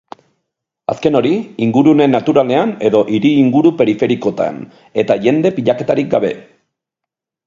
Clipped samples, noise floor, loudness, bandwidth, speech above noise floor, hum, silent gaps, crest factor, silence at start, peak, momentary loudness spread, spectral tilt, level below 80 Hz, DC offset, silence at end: under 0.1%; -82 dBFS; -14 LUFS; 7.4 kHz; 69 dB; none; none; 14 dB; 0.9 s; 0 dBFS; 10 LU; -7.5 dB/octave; -56 dBFS; under 0.1%; 1.05 s